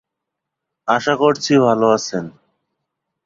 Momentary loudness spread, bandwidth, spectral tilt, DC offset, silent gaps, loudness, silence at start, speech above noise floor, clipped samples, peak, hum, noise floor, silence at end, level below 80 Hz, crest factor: 13 LU; 7.6 kHz; -5 dB/octave; under 0.1%; none; -16 LUFS; 0.85 s; 65 dB; under 0.1%; 0 dBFS; none; -81 dBFS; 0.95 s; -62 dBFS; 18 dB